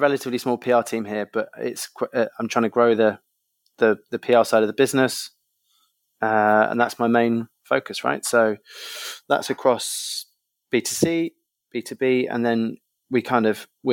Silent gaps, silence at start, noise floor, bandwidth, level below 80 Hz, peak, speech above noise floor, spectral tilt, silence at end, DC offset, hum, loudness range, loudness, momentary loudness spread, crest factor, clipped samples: none; 0 s; -71 dBFS; 17.5 kHz; -70 dBFS; -2 dBFS; 49 dB; -4 dB/octave; 0 s; under 0.1%; none; 4 LU; -22 LUFS; 12 LU; 20 dB; under 0.1%